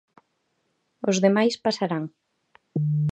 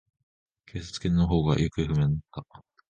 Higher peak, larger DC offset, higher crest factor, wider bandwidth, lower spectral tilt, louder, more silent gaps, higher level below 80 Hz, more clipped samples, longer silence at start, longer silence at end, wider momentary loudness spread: first, -6 dBFS vs -10 dBFS; neither; about the same, 20 dB vs 18 dB; about the same, 9 kHz vs 9 kHz; second, -6 dB/octave vs -7.5 dB/octave; about the same, -24 LUFS vs -26 LUFS; neither; second, -70 dBFS vs -40 dBFS; neither; first, 1.05 s vs 0.75 s; second, 0 s vs 0.45 s; second, 11 LU vs 17 LU